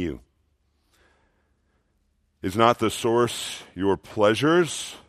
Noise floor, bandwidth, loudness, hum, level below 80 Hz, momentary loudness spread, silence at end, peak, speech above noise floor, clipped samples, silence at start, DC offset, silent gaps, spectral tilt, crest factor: -69 dBFS; 15 kHz; -23 LUFS; none; -58 dBFS; 13 LU; 0.1 s; -4 dBFS; 46 dB; under 0.1%; 0 s; under 0.1%; none; -4.5 dB/octave; 22 dB